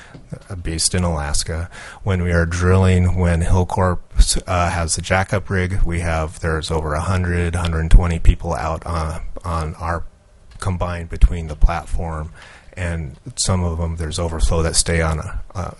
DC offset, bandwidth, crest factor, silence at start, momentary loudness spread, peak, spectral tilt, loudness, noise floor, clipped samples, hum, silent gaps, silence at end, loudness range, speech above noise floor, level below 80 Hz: under 0.1%; 11.5 kHz; 18 dB; 0 s; 11 LU; 0 dBFS; -5 dB/octave; -20 LUFS; -42 dBFS; under 0.1%; none; none; 0.05 s; 6 LU; 25 dB; -22 dBFS